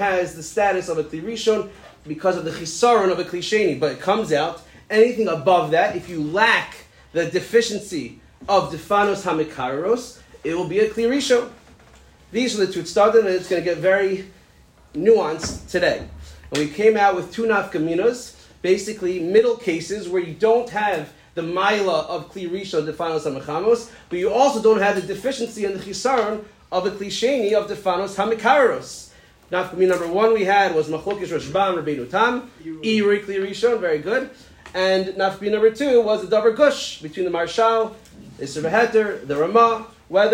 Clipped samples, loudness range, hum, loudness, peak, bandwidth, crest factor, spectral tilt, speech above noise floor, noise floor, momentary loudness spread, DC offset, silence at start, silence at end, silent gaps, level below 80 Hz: under 0.1%; 3 LU; none; -20 LUFS; -4 dBFS; 16 kHz; 16 dB; -4.5 dB/octave; 32 dB; -52 dBFS; 12 LU; under 0.1%; 0 s; 0 s; none; -52 dBFS